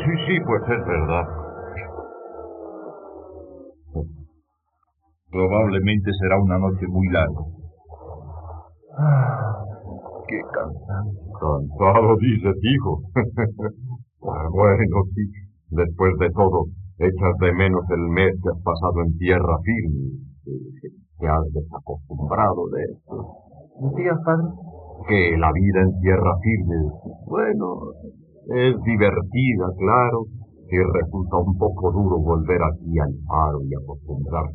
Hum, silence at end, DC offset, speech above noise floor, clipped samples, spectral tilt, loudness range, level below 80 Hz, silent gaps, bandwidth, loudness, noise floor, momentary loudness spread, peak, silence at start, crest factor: none; 0 s; under 0.1%; 51 dB; under 0.1%; -6.5 dB/octave; 6 LU; -38 dBFS; none; 4.4 kHz; -21 LUFS; -71 dBFS; 18 LU; -4 dBFS; 0 s; 18 dB